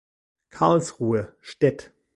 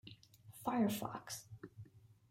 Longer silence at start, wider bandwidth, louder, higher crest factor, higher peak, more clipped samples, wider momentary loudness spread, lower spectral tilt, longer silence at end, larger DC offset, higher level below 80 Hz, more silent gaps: first, 0.55 s vs 0.05 s; second, 11.5 kHz vs 16 kHz; first, -23 LUFS vs -41 LUFS; about the same, 20 dB vs 18 dB; first, -4 dBFS vs -24 dBFS; neither; second, 13 LU vs 23 LU; first, -6.5 dB/octave vs -5 dB/octave; first, 0.35 s vs 0.2 s; neither; first, -58 dBFS vs -76 dBFS; neither